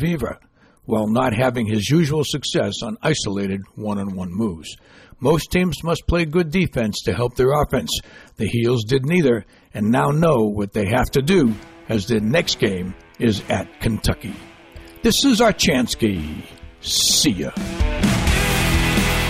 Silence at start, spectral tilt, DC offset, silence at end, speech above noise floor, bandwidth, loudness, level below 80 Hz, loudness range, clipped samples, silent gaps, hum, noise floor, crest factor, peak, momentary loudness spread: 0 s; -4.5 dB/octave; under 0.1%; 0 s; 22 dB; 16 kHz; -19 LUFS; -32 dBFS; 4 LU; under 0.1%; none; none; -41 dBFS; 14 dB; -6 dBFS; 10 LU